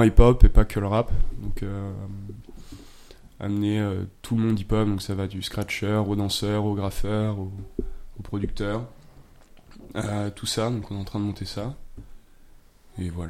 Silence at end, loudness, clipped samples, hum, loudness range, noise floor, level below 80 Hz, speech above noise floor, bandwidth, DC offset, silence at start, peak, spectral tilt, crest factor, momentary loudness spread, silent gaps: 0 s; -26 LUFS; under 0.1%; none; 6 LU; -50 dBFS; -28 dBFS; 28 dB; 14.5 kHz; under 0.1%; 0 s; 0 dBFS; -6.5 dB/octave; 24 dB; 15 LU; none